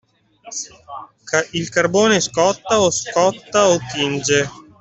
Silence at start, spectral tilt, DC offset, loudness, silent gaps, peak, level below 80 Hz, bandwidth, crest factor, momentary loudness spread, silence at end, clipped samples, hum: 0.45 s; -3 dB/octave; under 0.1%; -17 LUFS; none; -2 dBFS; -54 dBFS; 8.4 kHz; 16 dB; 15 LU; 0.2 s; under 0.1%; none